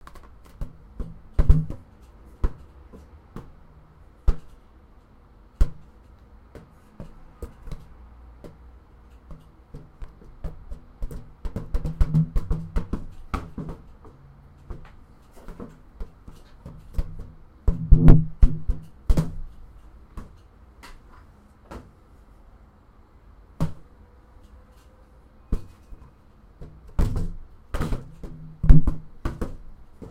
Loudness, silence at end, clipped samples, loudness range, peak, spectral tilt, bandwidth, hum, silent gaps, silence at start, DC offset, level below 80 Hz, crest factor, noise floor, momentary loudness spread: -27 LUFS; 0.05 s; under 0.1%; 22 LU; 0 dBFS; -9 dB/octave; 5.4 kHz; none; none; 0.6 s; under 0.1%; -28 dBFS; 24 dB; -52 dBFS; 26 LU